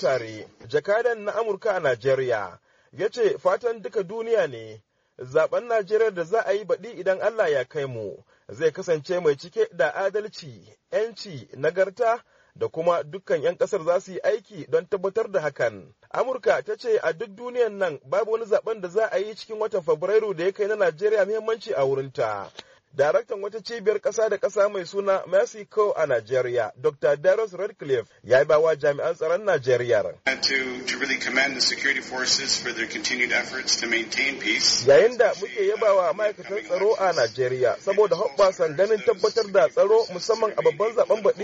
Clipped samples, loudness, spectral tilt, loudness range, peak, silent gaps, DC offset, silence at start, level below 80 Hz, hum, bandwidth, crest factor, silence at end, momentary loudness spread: under 0.1%; -24 LUFS; -2 dB/octave; 5 LU; -6 dBFS; none; under 0.1%; 0 s; -66 dBFS; none; 8 kHz; 16 dB; 0 s; 9 LU